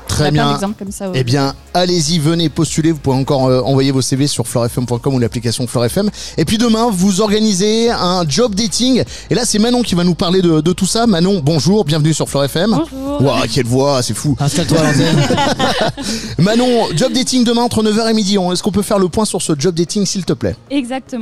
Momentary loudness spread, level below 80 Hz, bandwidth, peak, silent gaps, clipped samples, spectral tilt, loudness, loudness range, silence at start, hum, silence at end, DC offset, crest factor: 5 LU; -38 dBFS; 14.5 kHz; -2 dBFS; none; under 0.1%; -5 dB/octave; -14 LUFS; 2 LU; 0 s; none; 0 s; 2%; 12 dB